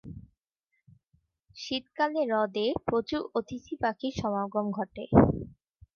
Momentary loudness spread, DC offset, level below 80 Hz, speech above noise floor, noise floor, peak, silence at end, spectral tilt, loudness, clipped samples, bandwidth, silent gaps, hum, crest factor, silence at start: 16 LU; under 0.1%; -48 dBFS; 52 dB; -80 dBFS; -6 dBFS; 0.45 s; -7 dB/octave; -29 LUFS; under 0.1%; 7 kHz; none; none; 24 dB; 0.05 s